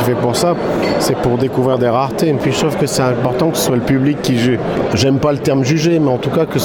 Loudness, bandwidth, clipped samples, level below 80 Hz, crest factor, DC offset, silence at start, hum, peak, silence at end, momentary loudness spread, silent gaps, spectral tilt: -15 LUFS; 17.5 kHz; under 0.1%; -42 dBFS; 12 dB; under 0.1%; 0 s; none; -2 dBFS; 0 s; 2 LU; none; -5.5 dB/octave